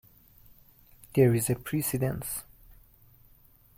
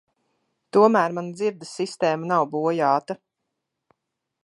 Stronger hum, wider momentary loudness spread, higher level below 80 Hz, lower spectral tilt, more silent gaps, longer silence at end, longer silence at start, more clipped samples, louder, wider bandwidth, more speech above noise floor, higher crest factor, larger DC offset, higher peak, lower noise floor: neither; about the same, 12 LU vs 13 LU; first, -56 dBFS vs -78 dBFS; about the same, -6 dB/octave vs -6 dB/octave; neither; about the same, 1.35 s vs 1.3 s; first, 1.15 s vs 0.75 s; neither; second, -28 LUFS vs -22 LUFS; first, 17 kHz vs 11.5 kHz; second, 32 dB vs 60 dB; about the same, 20 dB vs 20 dB; neither; second, -10 dBFS vs -4 dBFS; second, -59 dBFS vs -81 dBFS